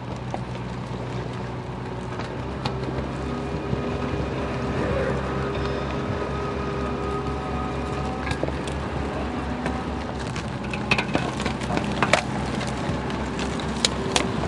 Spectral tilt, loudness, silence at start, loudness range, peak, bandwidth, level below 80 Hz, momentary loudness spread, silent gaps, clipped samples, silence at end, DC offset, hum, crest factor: -5 dB/octave; -27 LUFS; 0 s; 4 LU; 0 dBFS; 11.5 kHz; -38 dBFS; 8 LU; none; under 0.1%; 0 s; under 0.1%; none; 26 dB